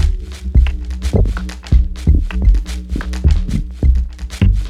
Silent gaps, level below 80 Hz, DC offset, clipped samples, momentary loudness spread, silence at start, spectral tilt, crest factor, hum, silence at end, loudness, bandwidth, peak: none; -16 dBFS; under 0.1%; under 0.1%; 8 LU; 0 s; -7 dB/octave; 12 dB; none; 0 s; -18 LUFS; 10.5 kHz; -2 dBFS